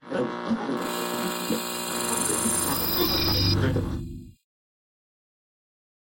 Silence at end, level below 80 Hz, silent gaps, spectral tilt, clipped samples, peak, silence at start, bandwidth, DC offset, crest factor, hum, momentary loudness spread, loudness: 1.7 s; -44 dBFS; none; -3.5 dB/octave; under 0.1%; -10 dBFS; 0.05 s; 17 kHz; under 0.1%; 18 dB; none; 8 LU; -25 LUFS